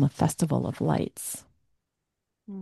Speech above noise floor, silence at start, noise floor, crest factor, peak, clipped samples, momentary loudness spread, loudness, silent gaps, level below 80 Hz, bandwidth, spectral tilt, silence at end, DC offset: 56 dB; 0 s; -83 dBFS; 20 dB; -10 dBFS; under 0.1%; 13 LU; -28 LUFS; none; -58 dBFS; 12.5 kHz; -6.5 dB/octave; 0 s; under 0.1%